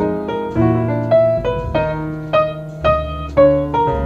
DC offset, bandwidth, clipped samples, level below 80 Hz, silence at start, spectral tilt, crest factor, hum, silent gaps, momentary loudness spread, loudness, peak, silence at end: under 0.1%; 7.2 kHz; under 0.1%; -32 dBFS; 0 s; -9 dB/octave; 16 dB; none; none; 8 LU; -17 LUFS; -2 dBFS; 0 s